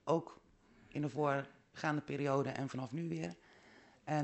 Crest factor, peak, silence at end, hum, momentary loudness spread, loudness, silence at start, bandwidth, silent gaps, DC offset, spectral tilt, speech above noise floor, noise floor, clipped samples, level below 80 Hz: 20 dB; -20 dBFS; 0 s; none; 15 LU; -39 LUFS; 0.05 s; 8.2 kHz; none; under 0.1%; -7 dB/octave; 27 dB; -65 dBFS; under 0.1%; -76 dBFS